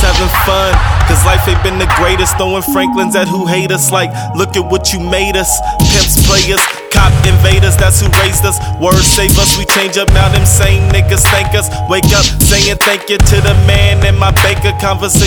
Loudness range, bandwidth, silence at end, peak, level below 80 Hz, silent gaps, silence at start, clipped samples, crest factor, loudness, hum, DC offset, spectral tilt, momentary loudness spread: 3 LU; over 20 kHz; 0 s; 0 dBFS; -16 dBFS; none; 0 s; 0.7%; 8 dB; -9 LUFS; none; under 0.1%; -3.5 dB/octave; 5 LU